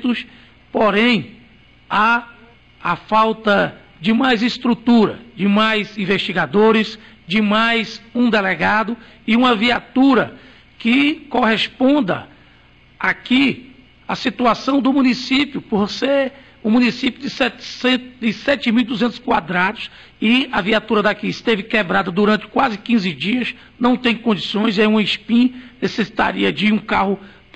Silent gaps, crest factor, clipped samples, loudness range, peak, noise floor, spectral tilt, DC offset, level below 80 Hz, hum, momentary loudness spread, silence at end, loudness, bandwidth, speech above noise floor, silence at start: none; 12 dB; under 0.1%; 2 LU; -6 dBFS; -49 dBFS; -5.5 dB/octave; under 0.1%; -50 dBFS; none; 8 LU; 0.3 s; -17 LUFS; 8.6 kHz; 32 dB; 0 s